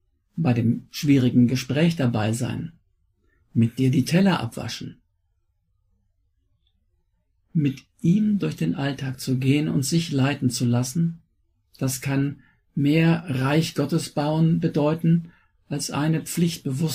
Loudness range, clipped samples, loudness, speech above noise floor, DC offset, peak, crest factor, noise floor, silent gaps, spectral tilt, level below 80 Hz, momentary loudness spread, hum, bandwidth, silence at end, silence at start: 5 LU; under 0.1%; -23 LUFS; 48 dB; under 0.1%; -6 dBFS; 16 dB; -70 dBFS; none; -6 dB/octave; -56 dBFS; 10 LU; none; 16 kHz; 0 s; 0.35 s